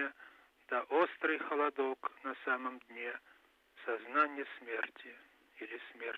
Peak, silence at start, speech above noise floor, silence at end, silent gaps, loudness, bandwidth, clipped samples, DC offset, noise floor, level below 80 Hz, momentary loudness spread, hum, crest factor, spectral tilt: -18 dBFS; 0 s; 27 dB; 0 s; none; -37 LUFS; 13.5 kHz; under 0.1%; under 0.1%; -65 dBFS; -88 dBFS; 15 LU; none; 20 dB; -4.5 dB/octave